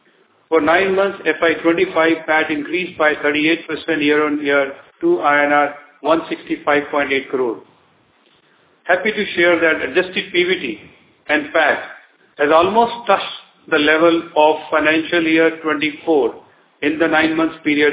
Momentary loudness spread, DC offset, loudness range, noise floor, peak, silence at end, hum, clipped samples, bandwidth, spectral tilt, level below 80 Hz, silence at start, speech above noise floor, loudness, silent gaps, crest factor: 8 LU; under 0.1%; 3 LU; -56 dBFS; 0 dBFS; 0 s; none; under 0.1%; 4 kHz; -8 dB/octave; -56 dBFS; 0.5 s; 39 dB; -16 LUFS; none; 18 dB